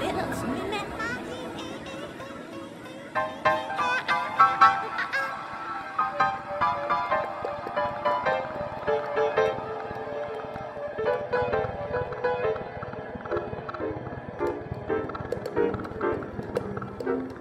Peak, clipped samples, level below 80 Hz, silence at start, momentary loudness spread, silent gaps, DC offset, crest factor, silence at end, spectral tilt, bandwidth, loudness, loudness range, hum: -4 dBFS; under 0.1%; -54 dBFS; 0 s; 11 LU; none; under 0.1%; 24 dB; 0 s; -5.5 dB/octave; 15 kHz; -28 LUFS; 7 LU; none